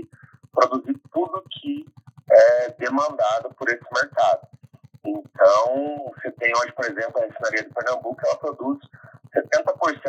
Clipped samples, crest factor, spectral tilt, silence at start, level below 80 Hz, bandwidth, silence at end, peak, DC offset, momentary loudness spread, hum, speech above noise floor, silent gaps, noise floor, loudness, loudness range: under 0.1%; 20 dB; -4 dB/octave; 0 s; -80 dBFS; 8.2 kHz; 0 s; -2 dBFS; under 0.1%; 14 LU; none; 28 dB; none; -50 dBFS; -22 LUFS; 5 LU